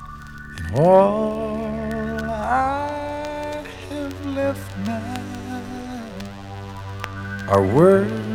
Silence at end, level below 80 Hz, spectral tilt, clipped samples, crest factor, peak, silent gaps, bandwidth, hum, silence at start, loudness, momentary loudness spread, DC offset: 0 s; -42 dBFS; -7 dB/octave; under 0.1%; 18 dB; -4 dBFS; none; 16 kHz; none; 0 s; -22 LUFS; 19 LU; under 0.1%